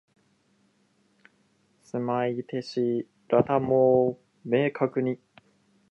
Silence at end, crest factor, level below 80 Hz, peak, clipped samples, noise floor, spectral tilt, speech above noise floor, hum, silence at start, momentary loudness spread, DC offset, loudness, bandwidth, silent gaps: 0.75 s; 18 dB; -66 dBFS; -10 dBFS; under 0.1%; -67 dBFS; -8 dB/octave; 43 dB; none; 1.95 s; 11 LU; under 0.1%; -26 LUFS; 8.2 kHz; none